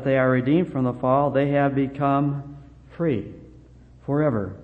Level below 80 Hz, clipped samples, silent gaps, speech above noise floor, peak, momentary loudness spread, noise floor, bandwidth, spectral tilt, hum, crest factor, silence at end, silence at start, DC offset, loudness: -52 dBFS; under 0.1%; none; 26 dB; -6 dBFS; 11 LU; -48 dBFS; 4.3 kHz; -10 dB/octave; none; 16 dB; 0 s; 0 s; under 0.1%; -22 LUFS